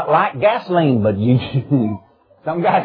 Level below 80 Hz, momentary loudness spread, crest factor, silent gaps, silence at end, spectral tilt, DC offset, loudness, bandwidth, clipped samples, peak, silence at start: -54 dBFS; 9 LU; 14 dB; none; 0 s; -10.5 dB/octave; under 0.1%; -17 LUFS; 5.2 kHz; under 0.1%; -2 dBFS; 0 s